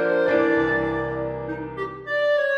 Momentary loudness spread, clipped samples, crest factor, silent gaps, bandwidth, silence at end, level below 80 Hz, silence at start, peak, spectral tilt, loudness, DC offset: 11 LU; under 0.1%; 14 dB; none; 6.8 kHz; 0 s; -48 dBFS; 0 s; -8 dBFS; -7 dB/octave; -23 LUFS; under 0.1%